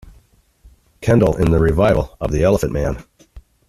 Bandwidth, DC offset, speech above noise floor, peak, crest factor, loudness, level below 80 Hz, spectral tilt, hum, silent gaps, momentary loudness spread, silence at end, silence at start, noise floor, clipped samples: 14 kHz; under 0.1%; 38 dB; -2 dBFS; 16 dB; -17 LUFS; -30 dBFS; -7.5 dB/octave; none; none; 10 LU; 0.3 s; 1 s; -53 dBFS; under 0.1%